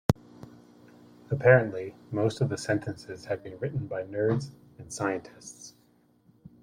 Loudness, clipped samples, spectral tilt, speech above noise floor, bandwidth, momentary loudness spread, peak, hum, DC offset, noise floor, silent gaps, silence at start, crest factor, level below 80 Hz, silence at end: -29 LUFS; under 0.1%; -6.5 dB/octave; 36 dB; 16 kHz; 24 LU; -6 dBFS; none; under 0.1%; -64 dBFS; none; 0.1 s; 24 dB; -56 dBFS; 0.9 s